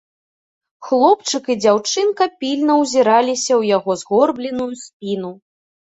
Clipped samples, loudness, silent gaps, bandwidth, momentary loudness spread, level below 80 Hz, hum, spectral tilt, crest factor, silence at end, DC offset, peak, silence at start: under 0.1%; -17 LUFS; 4.93-5.00 s; 8.4 kHz; 11 LU; -64 dBFS; none; -3.5 dB/octave; 16 dB; 0.5 s; under 0.1%; -2 dBFS; 0.8 s